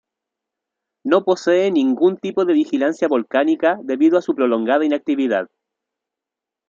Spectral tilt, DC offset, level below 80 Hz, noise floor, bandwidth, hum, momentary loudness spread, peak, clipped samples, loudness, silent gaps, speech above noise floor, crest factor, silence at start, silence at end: -6 dB/octave; under 0.1%; -72 dBFS; -86 dBFS; 7.4 kHz; none; 4 LU; -2 dBFS; under 0.1%; -18 LUFS; none; 69 dB; 16 dB; 1.05 s; 1.25 s